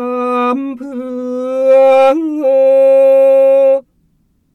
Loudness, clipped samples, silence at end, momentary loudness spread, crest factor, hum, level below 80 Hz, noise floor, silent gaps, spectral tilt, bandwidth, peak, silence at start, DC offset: -10 LUFS; under 0.1%; 0.75 s; 13 LU; 10 dB; none; -62 dBFS; -57 dBFS; none; -5 dB/octave; 6 kHz; 0 dBFS; 0 s; under 0.1%